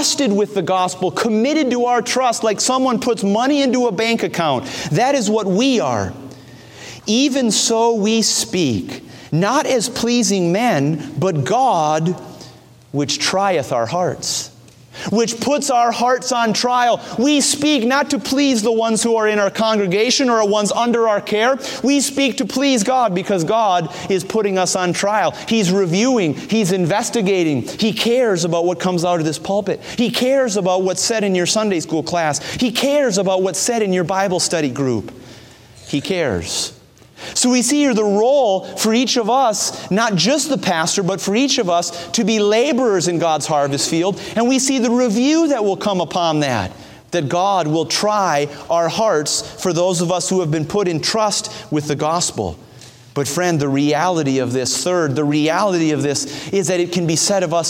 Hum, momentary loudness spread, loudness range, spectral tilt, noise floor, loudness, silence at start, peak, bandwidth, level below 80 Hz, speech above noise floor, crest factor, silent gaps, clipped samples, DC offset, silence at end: none; 6 LU; 3 LU; -4 dB/octave; -42 dBFS; -17 LUFS; 0 s; -2 dBFS; 16.5 kHz; -56 dBFS; 25 dB; 16 dB; none; under 0.1%; under 0.1%; 0 s